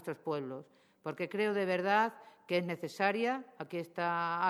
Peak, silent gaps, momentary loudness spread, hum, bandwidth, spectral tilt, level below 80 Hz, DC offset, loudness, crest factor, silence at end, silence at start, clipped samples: -14 dBFS; none; 12 LU; none; 19.5 kHz; -6 dB/octave; -86 dBFS; under 0.1%; -34 LUFS; 20 dB; 0 s; 0 s; under 0.1%